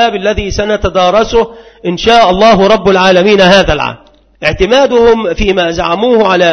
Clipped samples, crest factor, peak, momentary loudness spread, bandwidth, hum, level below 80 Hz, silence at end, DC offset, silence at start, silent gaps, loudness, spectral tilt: 0.4%; 8 dB; 0 dBFS; 9 LU; 11 kHz; none; -26 dBFS; 0 s; under 0.1%; 0 s; none; -8 LUFS; -5 dB/octave